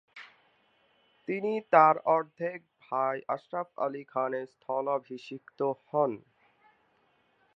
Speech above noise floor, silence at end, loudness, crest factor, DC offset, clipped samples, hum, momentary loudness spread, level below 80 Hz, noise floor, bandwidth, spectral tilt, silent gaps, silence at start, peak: 40 dB; 1.35 s; -30 LUFS; 26 dB; under 0.1%; under 0.1%; none; 21 LU; -86 dBFS; -70 dBFS; 7.2 kHz; -7.5 dB/octave; none; 0.15 s; -6 dBFS